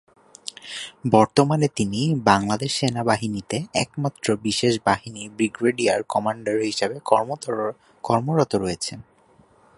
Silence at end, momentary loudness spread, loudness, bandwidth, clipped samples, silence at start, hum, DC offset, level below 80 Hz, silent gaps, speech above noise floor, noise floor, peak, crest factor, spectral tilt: 0.75 s; 13 LU; -22 LUFS; 11.5 kHz; under 0.1%; 0.45 s; none; under 0.1%; -54 dBFS; none; 34 dB; -56 dBFS; 0 dBFS; 22 dB; -5 dB/octave